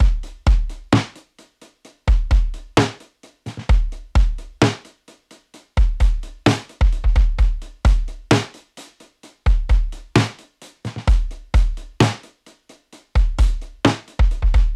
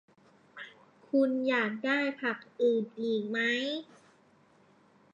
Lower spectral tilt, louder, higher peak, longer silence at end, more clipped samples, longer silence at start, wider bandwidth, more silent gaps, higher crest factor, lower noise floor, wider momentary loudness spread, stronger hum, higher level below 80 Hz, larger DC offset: about the same, -6 dB/octave vs -5 dB/octave; first, -21 LUFS vs -30 LUFS; first, -4 dBFS vs -16 dBFS; second, 0 s vs 1.3 s; neither; second, 0 s vs 0.55 s; first, 10.5 kHz vs 7.8 kHz; neither; about the same, 14 dB vs 16 dB; second, -50 dBFS vs -64 dBFS; second, 8 LU vs 17 LU; neither; first, -20 dBFS vs -88 dBFS; neither